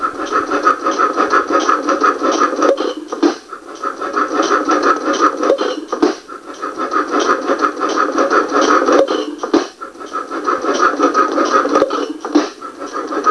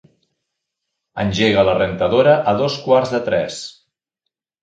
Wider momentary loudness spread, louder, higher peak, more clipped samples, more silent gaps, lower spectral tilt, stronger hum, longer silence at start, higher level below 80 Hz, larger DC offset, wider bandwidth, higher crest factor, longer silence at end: about the same, 12 LU vs 14 LU; about the same, -15 LUFS vs -16 LUFS; about the same, 0 dBFS vs 0 dBFS; neither; neither; second, -2.5 dB/octave vs -5.5 dB/octave; neither; second, 0 s vs 1.15 s; second, -58 dBFS vs -46 dBFS; neither; first, 11 kHz vs 9.2 kHz; about the same, 16 dB vs 18 dB; second, 0 s vs 0.9 s